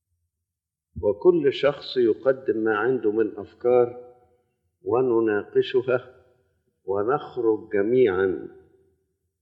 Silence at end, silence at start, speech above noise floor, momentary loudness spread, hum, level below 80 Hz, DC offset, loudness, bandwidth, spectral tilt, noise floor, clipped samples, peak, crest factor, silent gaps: 0.9 s; 0.95 s; 63 dB; 9 LU; none; -60 dBFS; under 0.1%; -23 LUFS; 5.4 kHz; -8 dB/octave; -86 dBFS; under 0.1%; -6 dBFS; 18 dB; none